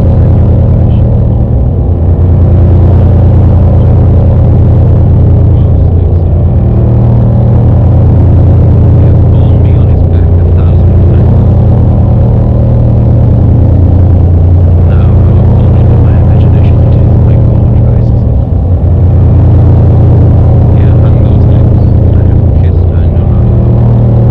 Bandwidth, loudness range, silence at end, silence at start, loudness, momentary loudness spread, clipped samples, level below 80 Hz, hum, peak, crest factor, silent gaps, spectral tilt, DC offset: 3.3 kHz; 1 LU; 0 s; 0 s; -6 LUFS; 3 LU; 6%; -10 dBFS; none; 0 dBFS; 4 dB; none; -12 dB/octave; 1%